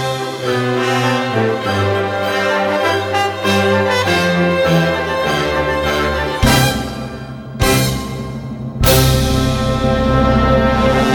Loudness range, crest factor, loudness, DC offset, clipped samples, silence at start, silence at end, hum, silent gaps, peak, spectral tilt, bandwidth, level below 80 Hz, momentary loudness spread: 2 LU; 14 dB; -15 LUFS; under 0.1%; under 0.1%; 0 s; 0 s; none; none; 0 dBFS; -5 dB/octave; over 20 kHz; -26 dBFS; 9 LU